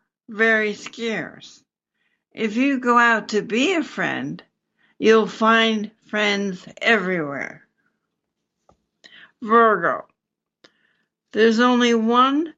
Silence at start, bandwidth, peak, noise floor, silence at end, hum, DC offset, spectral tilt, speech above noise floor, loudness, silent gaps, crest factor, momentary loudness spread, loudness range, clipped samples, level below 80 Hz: 0.3 s; 7.8 kHz; -4 dBFS; -83 dBFS; 0.05 s; none; under 0.1%; -4.5 dB/octave; 64 dB; -19 LUFS; none; 18 dB; 14 LU; 5 LU; under 0.1%; -76 dBFS